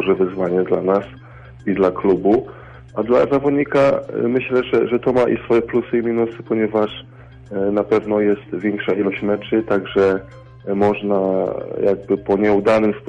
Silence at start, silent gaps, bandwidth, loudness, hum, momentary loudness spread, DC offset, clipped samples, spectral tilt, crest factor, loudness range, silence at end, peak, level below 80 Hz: 0 s; none; 8.2 kHz; -18 LUFS; none; 8 LU; under 0.1%; under 0.1%; -8 dB/octave; 14 dB; 3 LU; 0 s; -4 dBFS; -48 dBFS